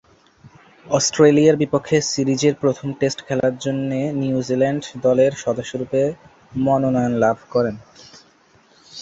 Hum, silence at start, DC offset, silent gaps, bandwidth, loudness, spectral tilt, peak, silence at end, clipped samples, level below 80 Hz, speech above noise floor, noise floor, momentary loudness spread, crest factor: none; 0.45 s; under 0.1%; none; 8 kHz; -19 LUFS; -5.5 dB/octave; -2 dBFS; 0 s; under 0.1%; -56 dBFS; 36 dB; -54 dBFS; 9 LU; 18 dB